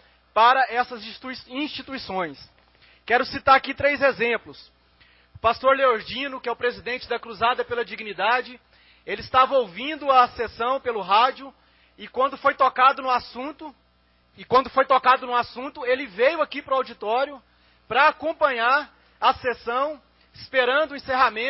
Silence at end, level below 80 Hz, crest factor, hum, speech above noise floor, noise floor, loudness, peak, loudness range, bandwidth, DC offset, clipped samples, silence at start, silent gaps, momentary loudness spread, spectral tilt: 0 s; -58 dBFS; 18 dB; none; 39 dB; -62 dBFS; -22 LUFS; -4 dBFS; 3 LU; 5.8 kHz; under 0.1%; under 0.1%; 0.35 s; none; 14 LU; -7 dB/octave